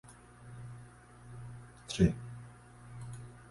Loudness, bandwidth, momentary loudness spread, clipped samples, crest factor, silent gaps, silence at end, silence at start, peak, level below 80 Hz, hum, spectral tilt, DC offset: -36 LUFS; 11.5 kHz; 25 LU; under 0.1%; 26 dB; none; 0 s; 0.05 s; -12 dBFS; -52 dBFS; 60 Hz at -50 dBFS; -6.5 dB/octave; under 0.1%